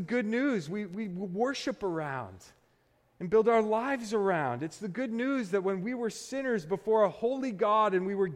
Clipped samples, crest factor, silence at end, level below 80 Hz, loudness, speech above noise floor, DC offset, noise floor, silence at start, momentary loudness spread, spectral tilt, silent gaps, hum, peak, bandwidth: under 0.1%; 16 dB; 0 s; -70 dBFS; -30 LUFS; 39 dB; under 0.1%; -69 dBFS; 0 s; 11 LU; -6 dB/octave; none; none; -14 dBFS; 12.5 kHz